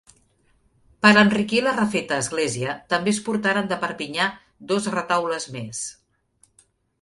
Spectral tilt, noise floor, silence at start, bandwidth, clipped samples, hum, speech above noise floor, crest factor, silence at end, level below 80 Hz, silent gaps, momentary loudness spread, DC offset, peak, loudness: -4 dB/octave; -63 dBFS; 1.05 s; 11.5 kHz; under 0.1%; none; 41 dB; 22 dB; 1.1 s; -60 dBFS; none; 14 LU; under 0.1%; -2 dBFS; -22 LUFS